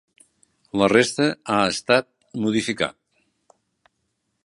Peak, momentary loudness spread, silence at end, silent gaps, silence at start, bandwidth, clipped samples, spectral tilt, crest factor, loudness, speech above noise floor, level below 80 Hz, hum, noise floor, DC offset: -2 dBFS; 10 LU; 1.55 s; none; 0.75 s; 11.5 kHz; under 0.1%; -4 dB/octave; 22 dB; -21 LUFS; 54 dB; -60 dBFS; none; -74 dBFS; under 0.1%